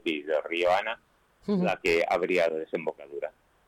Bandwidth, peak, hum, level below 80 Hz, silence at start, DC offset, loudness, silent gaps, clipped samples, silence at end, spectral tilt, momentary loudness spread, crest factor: 18.5 kHz; -18 dBFS; none; -64 dBFS; 0.05 s; under 0.1%; -28 LUFS; none; under 0.1%; 0.4 s; -5.5 dB/octave; 13 LU; 12 dB